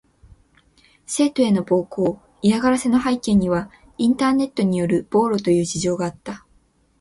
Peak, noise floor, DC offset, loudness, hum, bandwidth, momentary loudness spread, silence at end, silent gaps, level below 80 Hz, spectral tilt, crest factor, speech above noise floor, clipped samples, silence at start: -4 dBFS; -59 dBFS; under 0.1%; -20 LUFS; none; 11.5 kHz; 9 LU; 0.65 s; none; -50 dBFS; -5.5 dB/octave; 16 dB; 40 dB; under 0.1%; 1.1 s